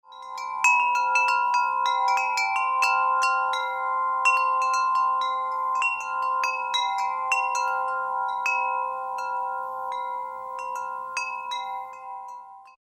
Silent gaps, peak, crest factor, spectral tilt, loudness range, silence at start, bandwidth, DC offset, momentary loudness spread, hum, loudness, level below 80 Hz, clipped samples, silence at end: none; -8 dBFS; 18 dB; 2 dB/octave; 9 LU; 0.1 s; 14 kHz; under 0.1%; 12 LU; none; -24 LUFS; -74 dBFS; under 0.1%; 0.2 s